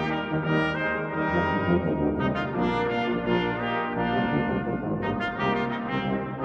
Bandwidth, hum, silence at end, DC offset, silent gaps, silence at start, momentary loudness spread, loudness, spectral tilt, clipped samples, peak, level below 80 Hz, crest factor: 7.8 kHz; none; 0 s; under 0.1%; none; 0 s; 4 LU; -26 LUFS; -8 dB/octave; under 0.1%; -8 dBFS; -48 dBFS; 16 dB